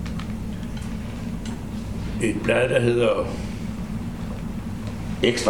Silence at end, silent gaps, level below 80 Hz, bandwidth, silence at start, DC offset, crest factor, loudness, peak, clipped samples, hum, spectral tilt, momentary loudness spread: 0 s; none; -36 dBFS; 18.5 kHz; 0 s; 0.7%; 22 dB; -26 LUFS; -2 dBFS; under 0.1%; none; -5.5 dB/octave; 12 LU